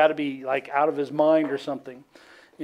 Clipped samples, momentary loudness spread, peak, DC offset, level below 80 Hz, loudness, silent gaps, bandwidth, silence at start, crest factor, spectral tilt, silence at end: under 0.1%; 13 LU; -6 dBFS; under 0.1%; -76 dBFS; -24 LUFS; none; 9.6 kHz; 0 s; 18 dB; -6.5 dB/octave; 0 s